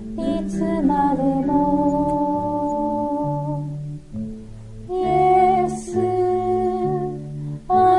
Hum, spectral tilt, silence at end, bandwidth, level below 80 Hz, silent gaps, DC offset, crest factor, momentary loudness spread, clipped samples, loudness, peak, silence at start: none; -8 dB/octave; 0 s; 11 kHz; -42 dBFS; none; under 0.1%; 14 dB; 14 LU; under 0.1%; -21 LUFS; -6 dBFS; 0 s